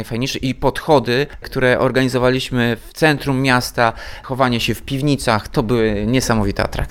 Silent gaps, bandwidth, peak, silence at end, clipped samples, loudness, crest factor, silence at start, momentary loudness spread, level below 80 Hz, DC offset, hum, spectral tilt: none; 17.5 kHz; 0 dBFS; 0 s; under 0.1%; -17 LUFS; 18 dB; 0 s; 5 LU; -34 dBFS; under 0.1%; none; -5.5 dB/octave